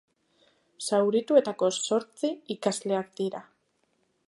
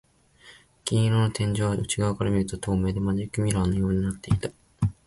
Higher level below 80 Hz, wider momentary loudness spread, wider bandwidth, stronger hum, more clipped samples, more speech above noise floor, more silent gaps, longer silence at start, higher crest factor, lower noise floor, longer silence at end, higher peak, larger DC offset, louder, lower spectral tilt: second, -80 dBFS vs -42 dBFS; first, 11 LU vs 5 LU; about the same, 11.5 kHz vs 11.5 kHz; neither; neither; first, 46 dB vs 29 dB; neither; first, 0.8 s vs 0.45 s; about the same, 20 dB vs 18 dB; first, -73 dBFS vs -54 dBFS; first, 0.85 s vs 0.15 s; about the same, -8 dBFS vs -8 dBFS; neither; about the same, -27 LUFS vs -26 LUFS; second, -4 dB/octave vs -6 dB/octave